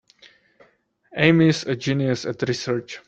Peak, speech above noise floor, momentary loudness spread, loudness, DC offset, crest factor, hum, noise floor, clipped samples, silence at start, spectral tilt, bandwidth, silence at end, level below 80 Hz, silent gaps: -2 dBFS; 40 dB; 10 LU; -21 LUFS; under 0.1%; 20 dB; none; -61 dBFS; under 0.1%; 1.15 s; -6 dB/octave; 8.2 kHz; 0.1 s; -58 dBFS; none